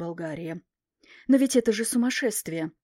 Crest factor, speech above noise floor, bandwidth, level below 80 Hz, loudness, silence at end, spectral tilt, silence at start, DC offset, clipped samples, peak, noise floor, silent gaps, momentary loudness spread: 18 dB; 31 dB; 16 kHz; -66 dBFS; -25 LUFS; 0.15 s; -4 dB/octave; 0 s; under 0.1%; under 0.1%; -8 dBFS; -57 dBFS; none; 16 LU